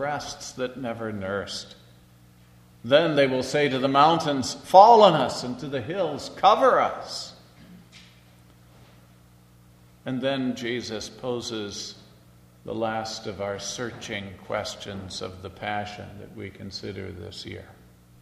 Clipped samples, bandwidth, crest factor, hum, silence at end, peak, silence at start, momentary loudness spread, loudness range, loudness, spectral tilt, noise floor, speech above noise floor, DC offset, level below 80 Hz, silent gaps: under 0.1%; 13.5 kHz; 24 dB; 60 Hz at -55 dBFS; 0.5 s; 0 dBFS; 0 s; 19 LU; 15 LU; -24 LUFS; -4.5 dB/octave; -54 dBFS; 30 dB; under 0.1%; -60 dBFS; none